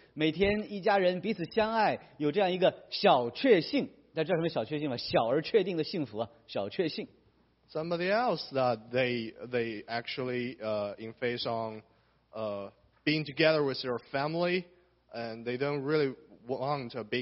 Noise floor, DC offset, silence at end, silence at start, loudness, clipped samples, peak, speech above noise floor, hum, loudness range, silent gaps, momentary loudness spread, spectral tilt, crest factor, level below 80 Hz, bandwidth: -67 dBFS; under 0.1%; 0 s; 0.15 s; -31 LUFS; under 0.1%; -10 dBFS; 37 dB; none; 6 LU; none; 12 LU; -3.5 dB/octave; 22 dB; -64 dBFS; 6 kHz